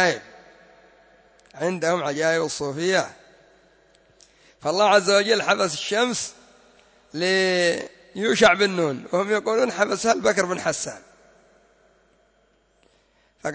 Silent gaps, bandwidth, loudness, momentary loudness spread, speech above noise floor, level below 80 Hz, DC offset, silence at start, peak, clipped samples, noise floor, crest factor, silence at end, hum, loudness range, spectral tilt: none; 8 kHz; -22 LUFS; 13 LU; 41 dB; -64 dBFS; under 0.1%; 0 s; -4 dBFS; under 0.1%; -63 dBFS; 20 dB; 0 s; none; 5 LU; -3 dB/octave